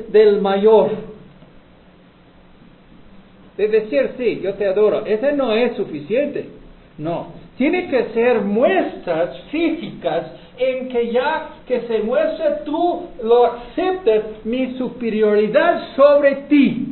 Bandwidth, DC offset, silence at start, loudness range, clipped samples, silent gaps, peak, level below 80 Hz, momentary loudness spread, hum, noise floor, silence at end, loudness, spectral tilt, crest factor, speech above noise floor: 4.4 kHz; under 0.1%; 0 s; 5 LU; under 0.1%; none; 0 dBFS; -50 dBFS; 12 LU; none; -48 dBFS; 0 s; -18 LUFS; -10 dB/octave; 18 dB; 30 dB